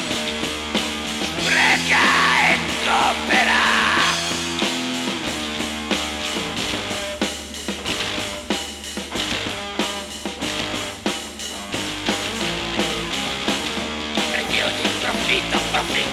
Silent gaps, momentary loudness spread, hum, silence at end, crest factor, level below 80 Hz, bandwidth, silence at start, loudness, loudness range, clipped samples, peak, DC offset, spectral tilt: none; 11 LU; none; 0 s; 16 dB; -44 dBFS; 17.5 kHz; 0 s; -20 LUFS; 8 LU; under 0.1%; -6 dBFS; under 0.1%; -2 dB/octave